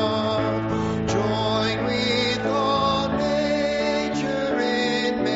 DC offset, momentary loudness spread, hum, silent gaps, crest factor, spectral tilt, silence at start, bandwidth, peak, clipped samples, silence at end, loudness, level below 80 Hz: under 0.1%; 3 LU; none; none; 14 dB; -3.5 dB/octave; 0 s; 8 kHz; -8 dBFS; under 0.1%; 0 s; -23 LUFS; -48 dBFS